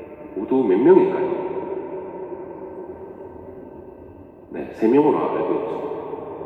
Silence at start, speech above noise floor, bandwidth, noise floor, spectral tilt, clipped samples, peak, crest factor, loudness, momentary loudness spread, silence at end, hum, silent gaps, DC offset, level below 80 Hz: 0 s; 24 dB; 4.2 kHz; -42 dBFS; -9.5 dB/octave; under 0.1%; -2 dBFS; 20 dB; -20 LUFS; 23 LU; 0 s; none; none; under 0.1%; -60 dBFS